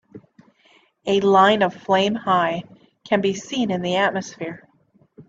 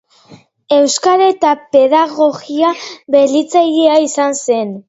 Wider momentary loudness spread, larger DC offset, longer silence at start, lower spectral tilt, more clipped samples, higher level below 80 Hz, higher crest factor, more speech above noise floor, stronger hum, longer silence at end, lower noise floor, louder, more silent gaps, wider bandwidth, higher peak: first, 17 LU vs 5 LU; neither; second, 0.15 s vs 0.3 s; first, -5 dB/octave vs -3 dB/octave; neither; about the same, -64 dBFS vs -62 dBFS; first, 18 dB vs 12 dB; first, 40 dB vs 31 dB; neither; about the same, 0.05 s vs 0.1 s; first, -59 dBFS vs -43 dBFS; second, -20 LUFS vs -12 LUFS; neither; about the same, 7.8 kHz vs 8 kHz; second, -4 dBFS vs 0 dBFS